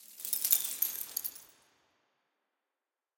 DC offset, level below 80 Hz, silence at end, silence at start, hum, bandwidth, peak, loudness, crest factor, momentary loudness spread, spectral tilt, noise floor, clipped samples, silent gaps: under 0.1%; -86 dBFS; 1.7 s; 0 s; none; 17.5 kHz; -4 dBFS; -31 LUFS; 34 dB; 10 LU; 2.5 dB/octave; under -90 dBFS; under 0.1%; none